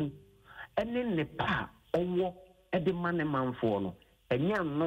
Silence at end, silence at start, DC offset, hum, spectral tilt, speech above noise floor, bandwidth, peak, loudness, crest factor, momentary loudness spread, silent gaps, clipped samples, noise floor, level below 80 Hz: 0 s; 0 s; under 0.1%; none; -8 dB/octave; 22 dB; 15.5 kHz; -18 dBFS; -33 LUFS; 14 dB; 6 LU; none; under 0.1%; -53 dBFS; -58 dBFS